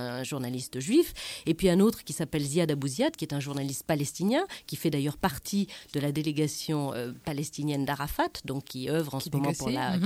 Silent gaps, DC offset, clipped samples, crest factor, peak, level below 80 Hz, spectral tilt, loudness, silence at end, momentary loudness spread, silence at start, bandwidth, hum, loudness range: none; under 0.1%; under 0.1%; 18 dB; -12 dBFS; -54 dBFS; -5.5 dB/octave; -30 LUFS; 0 s; 8 LU; 0 s; 16.5 kHz; none; 3 LU